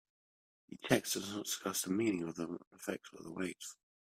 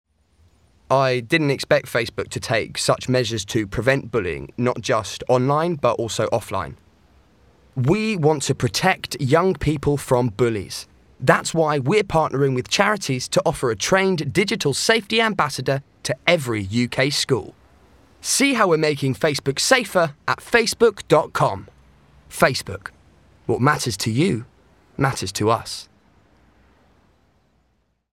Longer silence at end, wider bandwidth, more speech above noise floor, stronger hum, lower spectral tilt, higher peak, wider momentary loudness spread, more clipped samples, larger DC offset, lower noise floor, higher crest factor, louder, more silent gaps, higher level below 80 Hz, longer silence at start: second, 0.35 s vs 2.3 s; about the same, 16 kHz vs 16.5 kHz; first, over 52 dB vs 46 dB; neither; about the same, -3.5 dB/octave vs -4.5 dB/octave; second, -14 dBFS vs 0 dBFS; first, 15 LU vs 9 LU; neither; neither; first, under -90 dBFS vs -66 dBFS; about the same, 26 dB vs 22 dB; second, -38 LUFS vs -20 LUFS; first, 2.67-2.71 s vs none; second, -74 dBFS vs -48 dBFS; second, 0.7 s vs 0.9 s